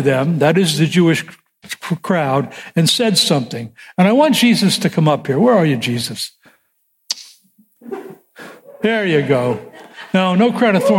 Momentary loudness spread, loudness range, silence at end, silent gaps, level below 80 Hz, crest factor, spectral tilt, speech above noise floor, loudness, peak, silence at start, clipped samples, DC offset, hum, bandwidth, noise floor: 15 LU; 8 LU; 0 s; none; -62 dBFS; 14 dB; -5 dB/octave; 50 dB; -15 LUFS; -2 dBFS; 0 s; under 0.1%; under 0.1%; none; 16.5 kHz; -64 dBFS